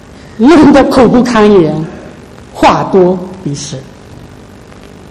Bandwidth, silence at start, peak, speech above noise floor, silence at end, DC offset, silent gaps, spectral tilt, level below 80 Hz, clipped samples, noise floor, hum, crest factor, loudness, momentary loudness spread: 13 kHz; 0.25 s; 0 dBFS; 26 dB; 0.85 s; under 0.1%; none; -6 dB/octave; -34 dBFS; 2%; -32 dBFS; none; 10 dB; -7 LUFS; 19 LU